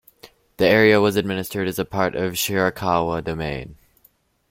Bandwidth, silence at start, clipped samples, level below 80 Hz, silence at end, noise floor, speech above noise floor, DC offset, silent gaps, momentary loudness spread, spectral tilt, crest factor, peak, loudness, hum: 16.5 kHz; 0.25 s; under 0.1%; -48 dBFS; 0.75 s; -60 dBFS; 40 dB; under 0.1%; none; 12 LU; -5 dB/octave; 20 dB; -2 dBFS; -20 LUFS; none